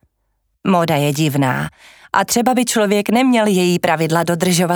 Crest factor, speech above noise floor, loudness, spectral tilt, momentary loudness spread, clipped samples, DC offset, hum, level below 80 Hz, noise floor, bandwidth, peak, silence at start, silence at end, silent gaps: 16 dB; 52 dB; -16 LUFS; -5 dB/octave; 5 LU; under 0.1%; under 0.1%; none; -56 dBFS; -67 dBFS; over 20 kHz; 0 dBFS; 0.65 s; 0 s; none